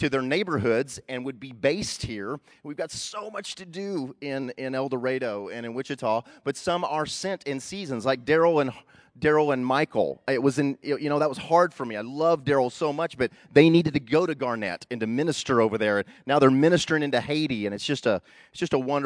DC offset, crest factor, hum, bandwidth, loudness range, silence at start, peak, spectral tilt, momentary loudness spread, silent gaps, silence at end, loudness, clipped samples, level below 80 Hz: under 0.1%; 22 dB; none; 11 kHz; 8 LU; 0 s; -4 dBFS; -5.5 dB/octave; 12 LU; none; 0 s; -25 LUFS; under 0.1%; -60 dBFS